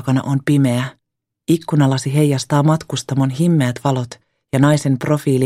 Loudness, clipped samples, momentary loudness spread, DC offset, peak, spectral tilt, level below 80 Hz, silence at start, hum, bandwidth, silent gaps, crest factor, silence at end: -17 LUFS; under 0.1%; 7 LU; under 0.1%; 0 dBFS; -6.5 dB/octave; -54 dBFS; 0 s; none; 14 kHz; none; 16 dB; 0 s